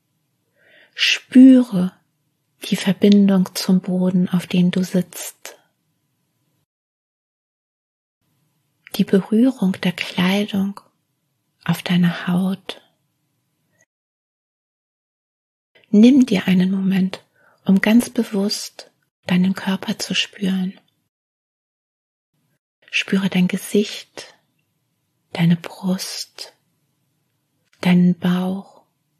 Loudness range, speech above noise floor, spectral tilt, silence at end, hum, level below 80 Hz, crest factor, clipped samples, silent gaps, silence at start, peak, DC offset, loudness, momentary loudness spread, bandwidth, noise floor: 9 LU; 53 dB; -6 dB/octave; 0.55 s; none; -68 dBFS; 18 dB; under 0.1%; 6.65-8.21 s, 13.86-15.75 s, 19.11-19.23 s, 21.09-22.33 s, 22.59-22.82 s; 0.95 s; -2 dBFS; under 0.1%; -18 LUFS; 17 LU; 13.5 kHz; -70 dBFS